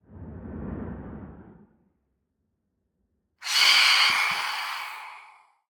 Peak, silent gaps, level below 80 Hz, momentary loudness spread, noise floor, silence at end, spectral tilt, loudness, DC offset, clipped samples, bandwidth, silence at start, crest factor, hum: -6 dBFS; none; -54 dBFS; 26 LU; -77 dBFS; 0.5 s; -0.5 dB/octave; -20 LUFS; under 0.1%; under 0.1%; over 20 kHz; 0.1 s; 22 dB; none